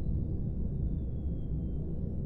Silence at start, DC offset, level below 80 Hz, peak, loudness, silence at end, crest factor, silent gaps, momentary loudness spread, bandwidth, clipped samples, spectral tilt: 0 s; under 0.1%; -36 dBFS; -22 dBFS; -36 LUFS; 0 s; 12 dB; none; 2 LU; 1.5 kHz; under 0.1%; -13 dB/octave